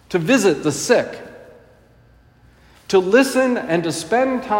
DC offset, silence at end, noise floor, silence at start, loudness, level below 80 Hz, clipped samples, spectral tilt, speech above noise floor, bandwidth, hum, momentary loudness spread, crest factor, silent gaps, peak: under 0.1%; 0 s; -51 dBFS; 0.1 s; -17 LUFS; -56 dBFS; under 0.1%; -4.5 dB/octave; 34 dB; 16.5 kHz; none; 6 LU; 18 dB; none; -2 dBFS